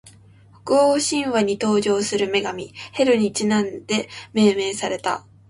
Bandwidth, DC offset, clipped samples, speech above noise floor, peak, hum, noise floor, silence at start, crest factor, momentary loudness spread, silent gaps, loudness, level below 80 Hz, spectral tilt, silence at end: 11.5 kHz; under 0.1%; under 0.1%; 29 dB; -6 dBFS; none; -49 dBFS; 0.05 s; 16 dB; 9 LU; none; -20 LUFS; -60 dBFS; -4 dB/octave; 0.3 s